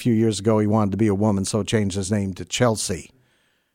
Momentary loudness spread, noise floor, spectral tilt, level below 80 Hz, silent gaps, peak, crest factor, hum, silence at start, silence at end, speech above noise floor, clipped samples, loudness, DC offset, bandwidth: 6 LU; -65 dBFS; -5.5 dB/octave; -52 dBFS; none; -6 dBFS; 14 dB; none; 0 s; 0.7 s; 44 dB; under 0.1%; -21 LUFS; under 0.1%; 16 kHz